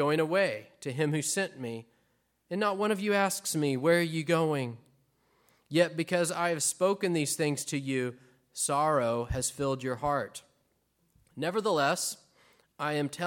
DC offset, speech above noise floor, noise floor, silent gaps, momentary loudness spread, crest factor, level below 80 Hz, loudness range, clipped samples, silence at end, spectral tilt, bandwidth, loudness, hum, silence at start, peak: under 0.1%; 44 dB; -73 dBFS; none; 12 LU; 18 dB; -58 dBFS; 3 LU; under 0.1%; 0 s; -4 dB/octave; 17.5 kHz; -30 LUFS; none; 0 s; -12 dBFS